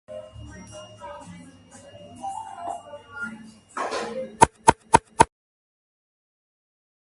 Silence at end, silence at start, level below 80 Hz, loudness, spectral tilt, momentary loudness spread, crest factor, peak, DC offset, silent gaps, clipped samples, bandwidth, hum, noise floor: 1.95 s; 0.1 s; -48 dBFS; -24 LUFS; -4 dB/octave; 24 LU; 28 dB; 0 dBFS; under 0.1%; none; under 0.1%; 11.5 kHz; none; -48 dBFS